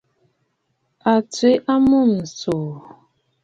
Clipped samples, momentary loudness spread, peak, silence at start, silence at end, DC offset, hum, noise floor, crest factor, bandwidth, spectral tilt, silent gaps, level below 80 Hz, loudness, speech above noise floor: under 0.1%; 10 LU; -4 dBFS; 1.05 s; 0.65 s; under 0.1%; none; -70 dBFS; 16 dB; 7.8 kHz; -6 dB/octave; none; -56 dBFS; -18 LUFS; 53 dB